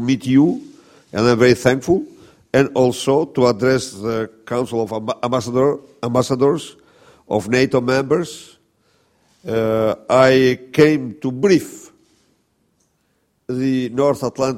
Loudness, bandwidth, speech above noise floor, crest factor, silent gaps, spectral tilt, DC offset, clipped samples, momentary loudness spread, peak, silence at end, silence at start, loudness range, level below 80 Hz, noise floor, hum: -17 LUFS; 15.5 kHz; 49 dB; 18 dB; none; -6 dB/octave; under 0.1%; under 0.1%; 11 LU; 0 dBFS; 0 s; 0 s; 4 LU; -52 dBFS; -65 dBFS; none